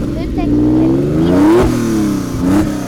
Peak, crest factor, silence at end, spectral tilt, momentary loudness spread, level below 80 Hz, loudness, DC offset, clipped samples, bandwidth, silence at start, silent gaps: -2 dBFS; 10 dB; 0 s; -7.5 dB/octave; 7 LU; -26 dBFS; -13 LUFS; under 0.1%; under 0.1%; 16.5 kHz; 0 s; none